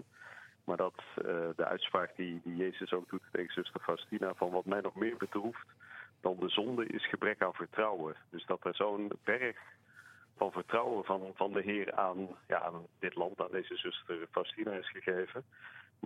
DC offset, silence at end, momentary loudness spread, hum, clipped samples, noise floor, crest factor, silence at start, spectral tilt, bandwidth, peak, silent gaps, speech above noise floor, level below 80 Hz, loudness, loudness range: under 0.1%; 0 s; 9 LU; none; under 0.1%; -60 dBFS; 24 dB; 0 s; -6 dB/octave; 13.5 kHz; -14 dBFS; none; 23 dB; -82 dBFS; -37 LUFS; 2 LU